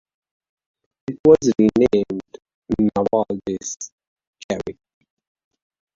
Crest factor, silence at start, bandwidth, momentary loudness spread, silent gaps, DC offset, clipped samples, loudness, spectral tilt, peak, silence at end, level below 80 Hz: 20 dB; 1.1 s; 7.6 kHz; 18 LU; 1.20-1.24 s, 2.54-2.62 s, 3.92-3.98 s, 4.07-4.16 s, 4.27-4.33 s, 4.44-4.49 s; under 0.1%; under 0.1%; -19 LUFS; -6 dB/octave; -2 dBFS; 1.25 s; -50 dBFS